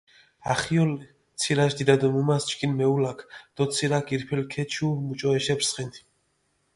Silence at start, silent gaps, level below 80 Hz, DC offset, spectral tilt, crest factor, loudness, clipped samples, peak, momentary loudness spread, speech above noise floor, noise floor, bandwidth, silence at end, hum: 0.45 s; none; -60 dBFS; under 0.1%; -5 dB/octave; 22 dB; -25 LUFS; under 0.1%; -4 dBFS; 13 LU; 46 dB; -71 dBFS; 11.5 kHz; 0.8 s; none